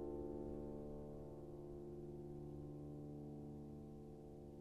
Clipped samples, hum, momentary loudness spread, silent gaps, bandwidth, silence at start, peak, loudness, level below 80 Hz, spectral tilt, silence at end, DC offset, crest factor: under 0.1%; none; 7 LU; none; 13 kHz; 0 s; -36 dBFS; -53 LUFS; -62 dBFS; -10 dB/octave; 0 s; under 0.1%; 14 dB